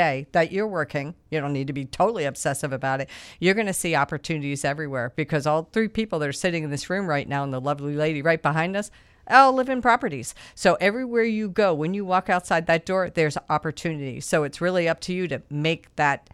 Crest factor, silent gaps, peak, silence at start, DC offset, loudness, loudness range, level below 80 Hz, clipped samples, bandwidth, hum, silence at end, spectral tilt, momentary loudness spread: 22 dB; none; -2 dBFS; 0 s; under 0.1%; -24 LUFS; 4 LU; -56 dBFS; under 0.1%; 15 kHz; none; 0.15 s; -5 dB/octave; 8 LU